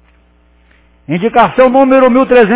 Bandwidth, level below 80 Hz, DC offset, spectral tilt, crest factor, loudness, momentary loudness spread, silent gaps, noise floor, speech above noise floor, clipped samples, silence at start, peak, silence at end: 4 kHz; -44 dBFS; under 0.1%; -10 dB/octave; 10 dB; -8 LUFS; 8 LU; none; -48 dBFS; 41 dB; 0.4%; 1.1 s; 0 dBFS; 0 s